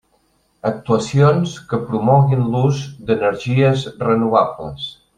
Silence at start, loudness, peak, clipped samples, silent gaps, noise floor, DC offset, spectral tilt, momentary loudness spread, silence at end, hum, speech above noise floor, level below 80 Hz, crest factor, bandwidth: 0.65 s; -17 LUFS; -2 dBFS; under 0.1%; none; -61 dBFS; under 0.1%; -7.5 dB/octave; 10 LU; 0.25 s; none; 45 dB; -50 dBFS; 16 dB; 9.6 kHz